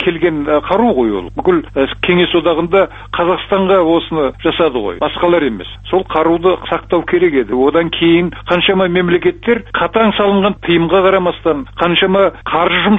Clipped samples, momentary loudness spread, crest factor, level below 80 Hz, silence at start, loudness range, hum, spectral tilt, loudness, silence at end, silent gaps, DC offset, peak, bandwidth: under 0.1%; 6 LU; 12 dB; -36 dBFS; 0 s; 2 LU; none; -8 dB/octave; -13 LUFS; 0 s; none; under 0.1%; 0 dBFS; 4 kHz